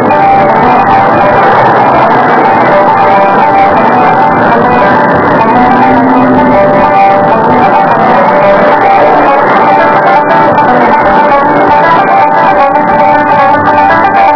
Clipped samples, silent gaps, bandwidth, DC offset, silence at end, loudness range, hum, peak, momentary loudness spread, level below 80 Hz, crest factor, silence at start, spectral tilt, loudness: 10%; none; 5.4 kHz; 2%; 0 s; 0 LU; none; 0 dBFS; 1 LU; -36 dBFS; 4 dB; 0 s; -8 dB/octave; -5 LUFS